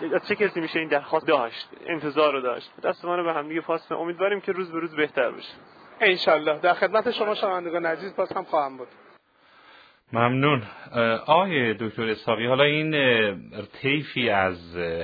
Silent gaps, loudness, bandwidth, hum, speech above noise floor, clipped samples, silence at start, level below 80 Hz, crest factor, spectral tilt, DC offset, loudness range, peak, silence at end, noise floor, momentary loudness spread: none; -24 LUFS; 5 kHz; none; 32 dB; under 0.1%; 0 s; -66 dBFS; 20 dB; -7.5 dB/octave; under 0.1%; 5 LU; -4 dBFS; 0 s; -57 dBFS; 10 LU